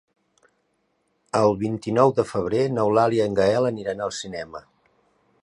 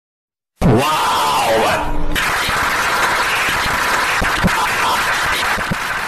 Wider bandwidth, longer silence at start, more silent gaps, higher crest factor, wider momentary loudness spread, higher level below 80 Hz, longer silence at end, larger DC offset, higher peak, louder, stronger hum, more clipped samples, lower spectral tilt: second, 11 kHz vs 15.5 kHz; first, 1.35 s vs 0.6 s; neither; first, 20 dB vs 10 dB; first, 13 LU vs 4 LU; second, -56 dBFS vs -28 dBFS; first, 0.8 s vs 0 s; neither; about the same, -4 dBFS vs -6 dBFS; second, -22 LUFS vs -15 LUFS; neither; neither; first, -6 dB/octave vs -3.5 dB/octave